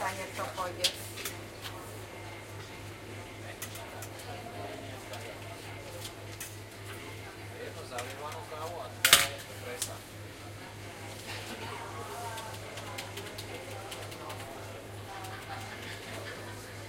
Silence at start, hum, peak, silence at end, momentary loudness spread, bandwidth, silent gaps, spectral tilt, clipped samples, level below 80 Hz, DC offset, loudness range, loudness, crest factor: 0 s; none; -4 dBFS; 0 s; 12 LU; 16.5 kHz; none; -2 dB/octave; under 0.1%; -60 dBFS; under 0.1%; 12 LU; -36 LUFS; 34 dB